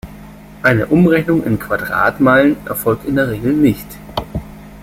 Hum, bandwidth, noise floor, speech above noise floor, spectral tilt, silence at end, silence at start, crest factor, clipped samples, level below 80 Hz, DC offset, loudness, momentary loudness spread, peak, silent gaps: none; 16.5 kHz; -36 dBFS; 22 dB; -7 dB/octave; 0 s; 0.05 s; 14 dB; under 0.1%; -38 dBFS; under 0.1%; -15 LUFS; 14 LU; 0 dBFS; none